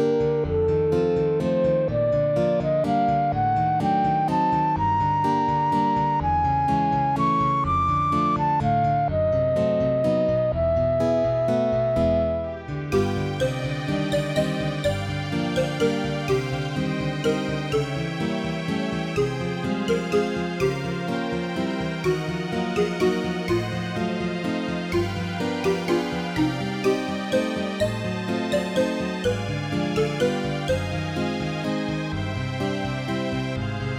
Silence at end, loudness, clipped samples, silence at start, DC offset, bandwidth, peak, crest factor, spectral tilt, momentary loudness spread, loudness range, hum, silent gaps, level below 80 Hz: 0 s; -24 LUFS; under 0.1%; 0 s; under 0.1%; 15.5 kHz; -10 dBFS; 14 dB; -6.5 dB/octave; 5 LU; 4 LU; none; none; -44 dBFS